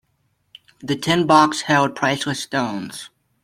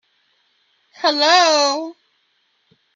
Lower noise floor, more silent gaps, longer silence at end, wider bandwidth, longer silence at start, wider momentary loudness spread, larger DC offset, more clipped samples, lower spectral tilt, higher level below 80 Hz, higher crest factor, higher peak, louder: about the same, -67 dBFS vs -65 dBFS; neither; second, 0.35 s vs 1.05 s; first, 16 kHz vs 9.4 kHz; second, 0.8 s vs 1 s; first, 17 LU vs 13 LU; neither; neither; first, -4.5 dB/octave vs 1 dB/octave; first, -58 dBFS vs -82 dBFS; about the same, 20 dB vs 20 dB; about the same, 0 dBFS vs 0 dBFS; second, -19 LUFS vs -15 LUFS